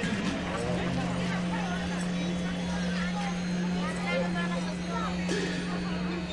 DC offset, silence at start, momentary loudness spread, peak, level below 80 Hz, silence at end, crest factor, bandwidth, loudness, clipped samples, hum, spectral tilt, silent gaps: under 0.1%; 0 s; 2 LU; -16 dBFS; -48 dBFS; 0 s; 14 dB; 11 kHz; -31 LUFS; under 0.1%; none; -5.5 dB/octave; none